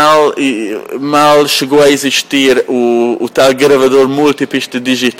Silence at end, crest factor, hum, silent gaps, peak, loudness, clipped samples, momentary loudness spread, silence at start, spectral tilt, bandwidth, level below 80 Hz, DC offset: 0.05 s; 10 dB; none; none; 0 dBFS; -10 LUFS; under 0.1%; 7 LU; 0 s; -3.5 dB/octave; 16.5 kHz; -52 dBFS; under 0.1%